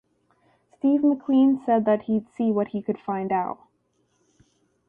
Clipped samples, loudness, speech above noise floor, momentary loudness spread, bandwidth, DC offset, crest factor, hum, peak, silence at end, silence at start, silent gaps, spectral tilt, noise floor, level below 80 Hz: under 0.1%; -23 LUFS; 47 dB; 9 LU; 3.6 kHz; under 0.1%; 14 dB; 60 Hz at -55 dBFS; -10 dBFS; 1.35 s; 0.85 s; none; -9.5 dB/octave; -69 dBFS; -68 dBFS